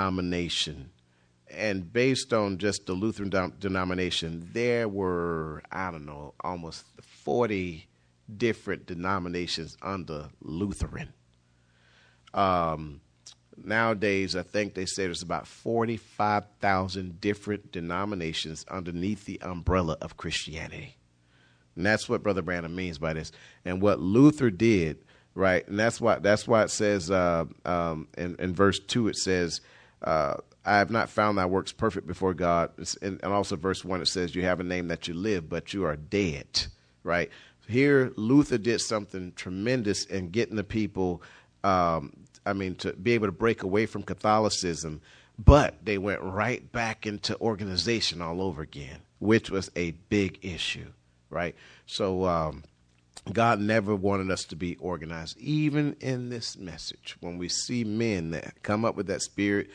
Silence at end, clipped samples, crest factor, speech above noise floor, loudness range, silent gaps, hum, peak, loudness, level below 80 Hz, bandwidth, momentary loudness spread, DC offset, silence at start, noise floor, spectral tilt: 0 s; under 0.1%; 26 dB; 37 dB; 7 LU; none; none; -2 dBFS; -28 LUFS; -44 dBFS; 10.5 kHz; 12 LU; under 0.1%; 0 s; -65 dBFS; -5 dB/octave